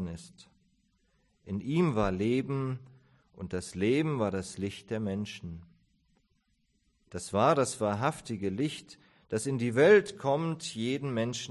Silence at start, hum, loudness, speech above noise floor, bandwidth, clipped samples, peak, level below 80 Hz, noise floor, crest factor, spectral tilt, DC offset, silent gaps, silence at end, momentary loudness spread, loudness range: 0 s; none; -30 LUFS; 44 dB; 12 kHz; under 0.1%; -10 dBFS; -56 dBFS; -74 dBFS; 20 dB; -5.5 dB/octave; under 0.1%; none; 0 s; 16 LU; 6 LU